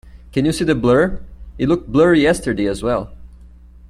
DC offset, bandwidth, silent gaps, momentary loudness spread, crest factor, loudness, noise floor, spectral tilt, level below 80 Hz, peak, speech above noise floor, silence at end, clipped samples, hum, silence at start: under 0.1%; 13.5 kHz; none; 10 LU; 16 dB; -17 LUFS; -41 dBFS; -6 dB/octave; -36 dBFS; -2 dBFS; 26 dB; 0.45 s; under 0.1%; none; 0.15 s